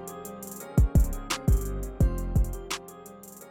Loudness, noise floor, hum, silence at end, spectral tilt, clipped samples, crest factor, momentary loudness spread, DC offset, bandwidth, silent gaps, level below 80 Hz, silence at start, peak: -28 LUFS; -46 dBFS; none; 0 s; -5.5 dB/octave; under 0.1%; 16 dB; 20 LU; under 0.1%; 17 kHz; none; -28 dBFS; 0 s; -10 dBFS